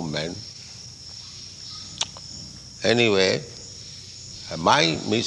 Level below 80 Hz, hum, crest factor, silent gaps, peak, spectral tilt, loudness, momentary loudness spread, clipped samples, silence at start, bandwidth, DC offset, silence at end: -56 dBFS; none; 22 dB; none; -4 dBFS; -3.5 dB/octave; -22 LUFS; 19 LU; under 0.1%; 0 s; 11.5 kHz; under 0.1%; 0 s